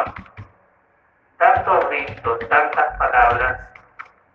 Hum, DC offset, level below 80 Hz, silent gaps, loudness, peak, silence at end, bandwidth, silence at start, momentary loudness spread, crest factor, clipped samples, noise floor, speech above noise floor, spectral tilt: none; under 0.1%; -42 dBFS; none; -18 LUFS; 0 dBFS; 0.3 s; 5.6 kHz; 0 s; 10 LU; 20 dB; under 0.1%; -59 dBFS; 40 dB; -6.5 dB/octave